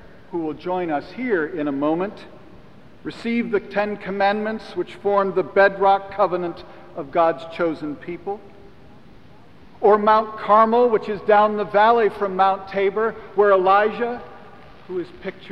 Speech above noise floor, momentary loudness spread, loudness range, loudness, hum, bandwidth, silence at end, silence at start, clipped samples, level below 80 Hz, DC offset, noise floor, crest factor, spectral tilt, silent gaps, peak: 28 dB; 15 LU; 8 LU; -20 LUFS; none; 6.2 kHz; 0 s; 0.3 s; under 0.1%; -56 dBFS; 0.5%; -48 dBFS; 18 dB; -7.5 dB/octave; none; -4 dBFS